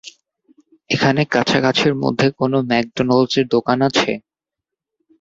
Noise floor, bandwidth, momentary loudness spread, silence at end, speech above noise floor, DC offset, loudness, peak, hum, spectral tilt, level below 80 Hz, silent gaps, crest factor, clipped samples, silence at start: -84 dBFS; 7.8 kHz; 4 LU; 1 s; 68 dB; under 0.1%; -17 LUFS; 0 dBFS; none; -5.5 dB/octave; -56 dBFS; none; 18 dB; under 0.1%; 0.05 s